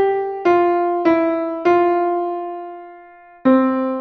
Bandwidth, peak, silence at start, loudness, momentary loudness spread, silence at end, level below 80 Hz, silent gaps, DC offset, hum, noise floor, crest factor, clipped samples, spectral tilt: 6.2 kHz; -2 dBFS; 0 s; -17 LUFS; 13 LU; 0 s; -60 dBFS; none; under 0.1%; none; -43 dBFS; 14 dB; under 0.1%; -7 dB/octave